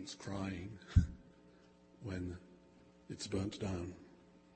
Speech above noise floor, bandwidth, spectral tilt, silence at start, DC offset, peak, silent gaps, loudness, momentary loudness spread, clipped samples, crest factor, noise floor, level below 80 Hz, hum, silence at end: 26 dB; 8.4 kHz; -6.5 dB/octave; 0 s; under 0.1%; -16 dBFS; none; -41 LUFS; 22 LU; under 0.1%; 26 dB; -64 dBFS; -48 dBFS; none; 0.15 s